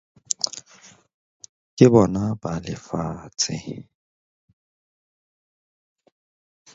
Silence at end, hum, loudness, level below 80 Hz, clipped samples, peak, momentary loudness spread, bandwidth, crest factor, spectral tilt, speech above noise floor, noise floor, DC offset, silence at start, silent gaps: 2.9 s; none; -22 LUFS; -52 dBFS; under 0.1%; 0 dBFS; 22 LU; 8.2 kHz; 26 dB; -5.5 dB/octave; 31 dB; -51 dBFS; under 0.1%; 0.45 s; 1.14-1.40 s, 1.49-1.77 s